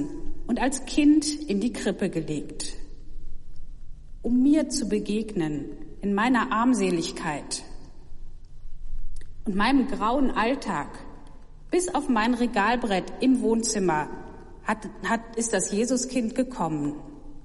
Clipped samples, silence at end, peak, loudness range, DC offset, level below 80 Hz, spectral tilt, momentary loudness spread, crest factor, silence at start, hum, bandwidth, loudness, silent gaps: under 0.1%; 0.05 s; -10 dBFS; 4 LU; under 0.1%; -38 dBFS; -4.5 dB/octave; 15 LU; 16 dB; 0 s; none; 11.5 kHz; -26 LUFS; none